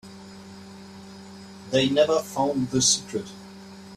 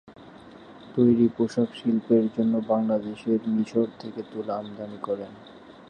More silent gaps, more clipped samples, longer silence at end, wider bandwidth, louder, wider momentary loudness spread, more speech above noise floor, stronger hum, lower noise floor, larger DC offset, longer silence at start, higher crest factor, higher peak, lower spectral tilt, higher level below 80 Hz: neither; neither; about the same, 0 s vs 0.1 s; first, 15 kHz vs 8.6 kHz; about the same, -23 LUFS vs -25 LUFS; first, 23 LU vs 13 LU; about the same, 20 dB vs 22 dB; neither; second, -43 dBFS vs -47 dBFS; neither; about the same, 0.05 s vs 0.05 s; about the same, 20 dB vs 18 dB; about the same, -6 dBFS vs -8 dBFS; second, -3 dB/octave vs -8.5 dB/octave; about the same, -60 dBFS vs -64 dBFS